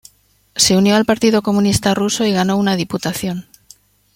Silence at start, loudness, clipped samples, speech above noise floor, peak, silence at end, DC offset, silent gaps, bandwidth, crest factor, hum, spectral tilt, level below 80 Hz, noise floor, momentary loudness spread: 0.55 s; -15 LUFS; under 0.1%; 40 dB; 0 dBFS; 0.75 s; under 0.1%; none; 16.5 kHz; 16 dB; 50 Hz at -35 dBFS; -4 dB/octave; -44 dBFS; -55 dBFS; 10 LU